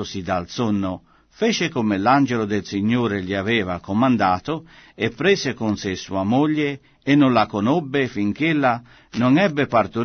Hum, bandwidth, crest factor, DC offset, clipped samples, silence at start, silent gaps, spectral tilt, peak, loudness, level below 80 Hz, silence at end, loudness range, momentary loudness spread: none; 6.6 kHz; 16 dB; under 0.1%; under 0.1%; 0 s; none; -6 dB/octave; -4 dBFS; -20 LUFS; -54 dBFS; 0 s; 2 LU; 9 LU